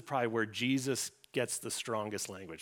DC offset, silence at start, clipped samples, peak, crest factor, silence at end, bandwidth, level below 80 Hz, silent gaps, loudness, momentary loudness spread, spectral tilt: under 0.1%; 0 s; under 0.1%; -18 dBFS; 18 dB; 0 s; 19 kHz; -78 dBFS; none; -35 LUFS; 6 LU; -3.5 dB/octave